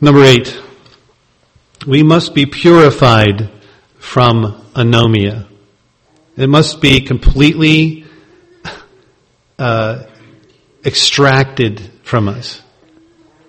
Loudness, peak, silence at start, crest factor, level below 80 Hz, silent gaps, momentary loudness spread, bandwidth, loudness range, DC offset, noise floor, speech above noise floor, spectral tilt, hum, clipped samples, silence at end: -10 LUFS; 0 dBFS; 0 s; 12 dB; -26 dBFS; none; 20 LU; 11.5 kHz; 5 LU; under 0.1%; -54 dBFS; 45 dB; -5.5 dB/octave; none; 0.7%; 0.95 s